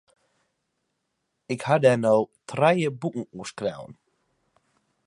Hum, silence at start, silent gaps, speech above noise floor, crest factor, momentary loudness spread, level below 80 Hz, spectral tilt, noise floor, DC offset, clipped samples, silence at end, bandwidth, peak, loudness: none; 1.5 s; none; 54 dB; 22 dB; 15 LU; -70 dBFS; -6 dB/octave; -78 dBFS; under 0.1%; under 0.1%; 1.15 s; 11.5 kHz; -6 dBFS; -24 LUFS